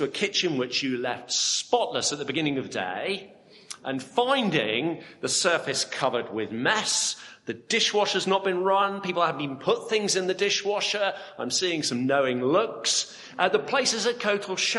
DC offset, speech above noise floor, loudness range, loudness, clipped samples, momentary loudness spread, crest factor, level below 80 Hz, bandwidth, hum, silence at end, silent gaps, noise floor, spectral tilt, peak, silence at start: under 0.1%; 20 dB; 3 LU; -25 LUFS; under 0.1%; 8 LU; 20 dB; -74 dBFS; 11.5 kHz; none; 0 s; none; -46 dBFS; -2.5 dB/octave; -6 dBFS; 0 s